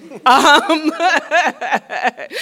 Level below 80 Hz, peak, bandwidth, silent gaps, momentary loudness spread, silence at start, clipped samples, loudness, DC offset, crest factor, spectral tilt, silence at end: -60 dBFS; 0 dBFS; 17 kHz; none; 11 LU; 0.05 s; 0.3%; -14 LUFS; under 0.1%; 14 dB; -1.5 dB/octave; 0 s